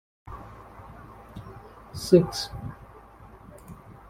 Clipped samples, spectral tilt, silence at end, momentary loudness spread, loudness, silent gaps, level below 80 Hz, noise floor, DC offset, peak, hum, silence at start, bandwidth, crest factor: under 0.1%; -6.5 dB/octave; 0.15 s; 27 LU; -24 LUFS; none; -50 dBFS; -49 dBFS; under 0.1%; -4 dBFS; none; 0.25 s; 16 kHz; 26 dB